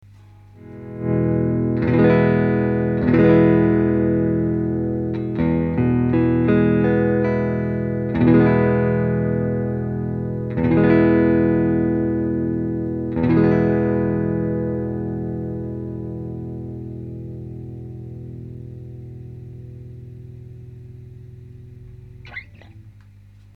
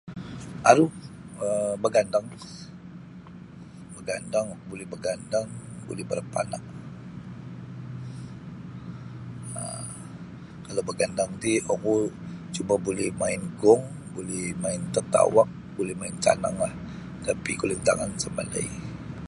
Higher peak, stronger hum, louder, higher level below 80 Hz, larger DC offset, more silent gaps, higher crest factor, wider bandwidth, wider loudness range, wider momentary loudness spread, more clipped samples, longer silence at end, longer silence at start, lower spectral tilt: about the same, -2 dBFS vs -2 dBFS; first, 50 Hz at -45 dBFS vs none; first, -19 LUFS vs -27 LUFS; first, -40 dBFS vs -54 dBFS; neither; neither; second, 18 dB vs 26 dB; second, 4.9 kHz vs 11.5 kHz; first, 21 LU vs 12 LU; about the same, 22 LU vs 20 LU; neither; first, 0.65 s vs 0 s; first, 0.6 s vs 0.05 s; first, -11 dB/octave vs -5 dB/octave